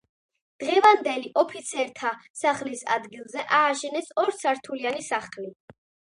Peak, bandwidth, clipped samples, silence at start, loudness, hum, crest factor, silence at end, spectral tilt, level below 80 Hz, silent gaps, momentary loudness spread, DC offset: -4 dBFS; 11.5 kHz; under 0.1%; 0.6 s; -25 LUFS; none; 20 dB; 0.6 s; -2 dB/octave; -76 dBFS; 2.30-2.34 s; 15 LU; under 0.1%